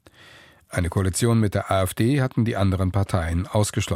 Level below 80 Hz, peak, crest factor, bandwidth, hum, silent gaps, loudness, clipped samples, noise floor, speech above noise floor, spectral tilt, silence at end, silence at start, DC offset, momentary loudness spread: -40 dBFS; -4 dBFS; 18 dB; 16 kHz; none; none; -23 LUFS; under 0.1%; -50 dBFS; 28 dB; -6 dB/octave; 0 s; 0.7 s; under 0.1%; 4 LU